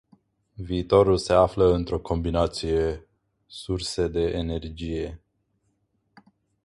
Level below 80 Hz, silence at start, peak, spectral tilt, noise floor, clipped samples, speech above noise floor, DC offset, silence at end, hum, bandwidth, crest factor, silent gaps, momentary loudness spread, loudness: -40 dBFS; 0.6 s; -4 dBFS; -6.5 dB/octave; -72 dBFS; under 0.1%; 48 dB; under 0.1%; 1.5 s; none; 11.5 kHz; 22 dB; none; 15 LU; -24 LUFS